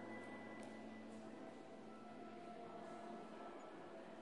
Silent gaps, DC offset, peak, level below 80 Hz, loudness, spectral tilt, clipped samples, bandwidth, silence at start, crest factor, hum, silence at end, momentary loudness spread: none; under 0.1%; -40 dBFS; under -90 dBFS; -55 LUFS; -5.5 dB/octave; under 0.1%; 11 kHz; 0 s; 14 dB; none; 0 s; 3 LU